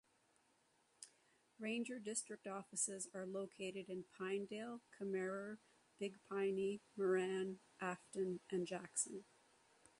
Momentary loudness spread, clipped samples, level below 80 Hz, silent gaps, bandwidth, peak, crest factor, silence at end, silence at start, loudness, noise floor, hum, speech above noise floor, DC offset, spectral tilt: 11 LU; under 0.1%; -88 dBFS; none; 11.5 kHz; -26 dBFS; 20 dB; 0.75 s; 1 s; -45 LUFS; -78 dBFS; none; 33 dB; under 0.1%; -4 dB/octave